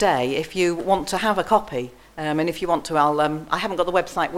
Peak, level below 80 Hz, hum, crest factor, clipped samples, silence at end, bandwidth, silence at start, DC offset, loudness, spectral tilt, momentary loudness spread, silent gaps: -2 dBFS; -48 dBFS; none; 18 dB; under 0.1%; 0 s; 16.5 kHz; 0 s; under 0.1%; -22 LUFS; -4.5 dB/octave; 7 LU; none